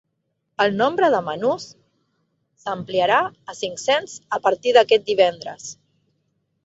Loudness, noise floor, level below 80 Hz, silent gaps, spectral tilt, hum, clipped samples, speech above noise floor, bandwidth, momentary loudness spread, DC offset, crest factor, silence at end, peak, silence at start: -20 LUFS; -74 dBFS; -68 dBFS; none; -3.5 dB/octave; none; under 0.1%; 54 dB; 8 kHz; 17 LU; under 0.1%; 20 dB; 0.9 s; -2 dBFS; 0.6 s